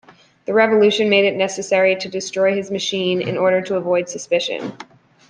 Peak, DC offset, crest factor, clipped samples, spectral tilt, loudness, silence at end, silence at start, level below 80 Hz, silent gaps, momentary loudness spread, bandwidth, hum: -2 dBFS; under 0.1%; 16 dB; under 0.1%; -4 dB/octave; -18 LUFS; 0.45 s; 0.5 s; -66 dBFS; none; 9 LU; 10 kHz; none